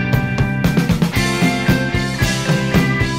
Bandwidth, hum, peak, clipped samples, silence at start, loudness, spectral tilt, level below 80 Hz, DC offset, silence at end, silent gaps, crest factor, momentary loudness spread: 16.5 kHz; none; -2 dBFS; under 0.1%; 0 s; -16 LUFS; -5.5 dB/octave; -30 dBFS; 0.6%; 0 s; none; 14 dB; 2 LU